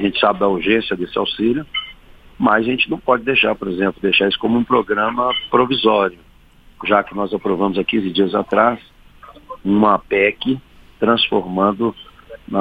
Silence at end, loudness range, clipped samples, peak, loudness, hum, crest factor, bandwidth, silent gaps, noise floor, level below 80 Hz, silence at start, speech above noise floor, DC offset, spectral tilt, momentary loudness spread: 0 s; 2 LU; under 0.1%; 0 dBFS; -17 LUFS; none; 18 dB; 5 kHz; none; -47 dBFS; -48 dBFS; 0 s; 30 dB; under 0.1%; -7.5 dB/octave; 8 LU